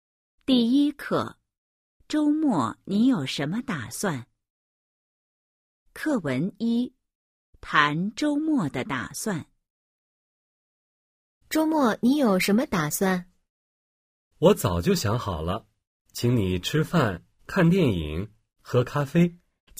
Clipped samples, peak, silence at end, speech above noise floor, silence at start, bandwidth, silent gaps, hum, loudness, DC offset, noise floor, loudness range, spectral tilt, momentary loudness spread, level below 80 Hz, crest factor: under 0.1%; -4 dBFS; 0.45 s; over 66 dB; 0.5 s; 15.5 kHz; 1.58-2.00 s, 4.50-5.86 s, 7.15-7.53 s, 9.70-11.41 s, 13.50-14.31 s, 15.87-16.05 s; none; -25 LUFS; under 0.1%; under -90 dBFS; 7 LU; -5.5 dB/octave; 10 LU; -50 dBFS; 22 dB